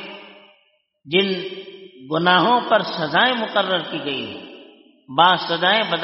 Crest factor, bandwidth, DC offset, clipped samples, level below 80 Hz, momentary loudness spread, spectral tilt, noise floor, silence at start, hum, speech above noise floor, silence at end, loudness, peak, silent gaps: 20 dB; 5.8 kHz; under 0.1%; under 0.1%; -68 dBFS; 18 LU; -1.5 dB/octave; -63 dBFS; 0 s; none; 44 dB; 0 s; -19 LUFS; 0 dBFS; none